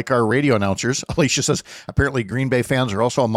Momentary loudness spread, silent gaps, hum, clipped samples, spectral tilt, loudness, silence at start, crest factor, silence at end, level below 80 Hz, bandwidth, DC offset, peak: 5 LU; none; none; under 0.1%; -4.5 dB/octave; -19 LUFS; 0 s; 14 dB; 0 s; -40 dBFS; 15 kHz; under 0.1%; -6 dBFS